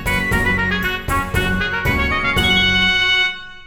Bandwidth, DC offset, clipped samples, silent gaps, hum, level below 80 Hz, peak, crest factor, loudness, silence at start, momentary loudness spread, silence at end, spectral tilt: over 20 kHz; under 0.1%; under 0.1%; none; none; -28 dBFS; -2 dBFS; 14 dB; -16 LUFS; 0 s; 7 LU; 0 s; -4 dB/octave